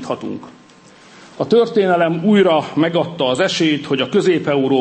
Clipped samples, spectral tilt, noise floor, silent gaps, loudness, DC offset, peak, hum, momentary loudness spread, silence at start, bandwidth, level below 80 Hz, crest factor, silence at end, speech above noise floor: under 0.1%; -5.5 dB/octave; -45 dBFS; none; -16 LUFS; under 0.1%; -4 dBFS; none; 12 LU; 0 s; 8.8 kHz; -62 dBFS; 14 dB; 0 s; 29 dB